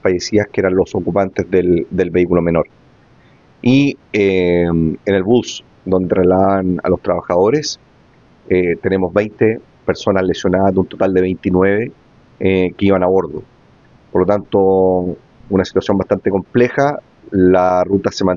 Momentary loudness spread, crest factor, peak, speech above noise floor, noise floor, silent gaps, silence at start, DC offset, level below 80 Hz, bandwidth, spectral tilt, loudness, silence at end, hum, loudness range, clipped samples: 7 LU; 14 dB; -2 dBFS; 34 dB; -48 dBFS; none; 0.05 s; under 0.1%; -48 dBFS; 7.4 kHz; -6.5 dB/octave; -15 LUFS; 0 s; none; 2 LU; under 0.1%